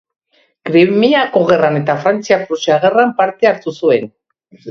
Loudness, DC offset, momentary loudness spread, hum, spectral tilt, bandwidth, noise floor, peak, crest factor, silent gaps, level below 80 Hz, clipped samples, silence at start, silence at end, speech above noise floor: -13 LUFS; under 0.1%; 5 LU; none; -6 dB/octave; 7.2 kHz; -35 dBFS; 0 dBFS; 14 dB; none; -58 dBFS; under 0.1%; 0.65 s; 0 s; 23 dB